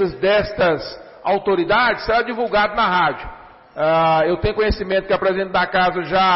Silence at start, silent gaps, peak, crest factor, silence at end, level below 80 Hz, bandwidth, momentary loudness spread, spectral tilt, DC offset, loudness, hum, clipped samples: 0 s; none; -8 dBFS; 10 dB; 0 s; -38 dBFS; 5.8 kHz; 7 LU; -9 dB/octave; under 0.1%; -18 LUFS; none; under 0.1%